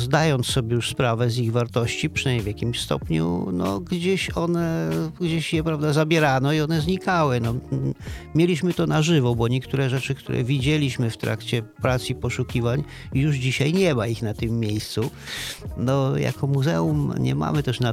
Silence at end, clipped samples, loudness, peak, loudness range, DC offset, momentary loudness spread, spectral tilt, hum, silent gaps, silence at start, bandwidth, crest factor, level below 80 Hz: 0 s; under 0.1%; -23 LUFS; -6 dBFS; 2 LU; under 0.1%; 7 LU; -6 dB/octave; none; none; 0 s; 15.5 kHz; 16 dB; -44 dBFS